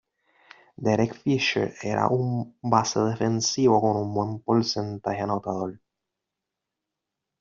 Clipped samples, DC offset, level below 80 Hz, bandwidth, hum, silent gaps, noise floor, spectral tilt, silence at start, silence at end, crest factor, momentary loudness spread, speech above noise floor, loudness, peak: under 0.1%; under 0.1%; -62 dBFS; 7.6 kHz; none; none; -85 dBFS; -5 dB/octave; 0.8 s; 1.65 s; 20 dB; 8 LU; 61 dB; -25 LUFS; -6 dBFS